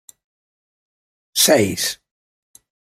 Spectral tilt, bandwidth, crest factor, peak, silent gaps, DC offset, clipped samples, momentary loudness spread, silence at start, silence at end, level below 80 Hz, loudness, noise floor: -2.5 dB/octave; 16 kHz; 22 dB; -2 dBFS; none; under 0.1%; under 0.1%; 12 LU; 1.35 s; 1 s; -62 dBFS; -17 LUFS; under -90 dBFS